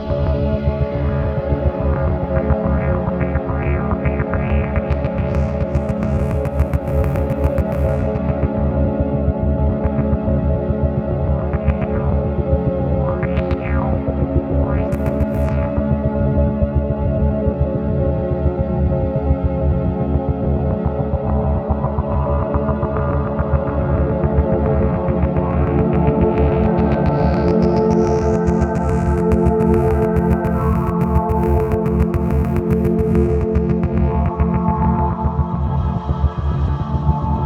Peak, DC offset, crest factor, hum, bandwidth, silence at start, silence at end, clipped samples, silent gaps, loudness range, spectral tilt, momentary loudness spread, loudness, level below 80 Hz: -2 dBFS; under 0.1%; 16 dB; none; 6.4 kHz; 0 s; 0 s; under 0.1%; none; 3 LU; -10 dB/octave; 4 LU; -18 LUFS; -22 dBFS